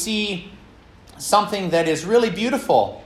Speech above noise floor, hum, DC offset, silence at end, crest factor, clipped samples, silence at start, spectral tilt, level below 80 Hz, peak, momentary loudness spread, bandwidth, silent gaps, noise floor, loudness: 27 dB; none; under 0.1%; 0 s; 18 dB; under 0.1%; 0 s; -4 dB/octave; -52 dBFS; -2 dBFS; 7 LU; 15 kHz; none; -47 dBFS; -20 LUFS